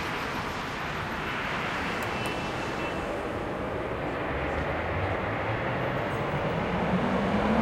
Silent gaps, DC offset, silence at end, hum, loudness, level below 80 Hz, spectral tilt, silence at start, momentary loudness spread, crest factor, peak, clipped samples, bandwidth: none; under 0.1%; 0 s; none; -30 LUFS; -44 dBFS; -6 dB/octave; 0 s; 5 LU; 18 dB; -12 dBFS; under 0.1%; 16 kHz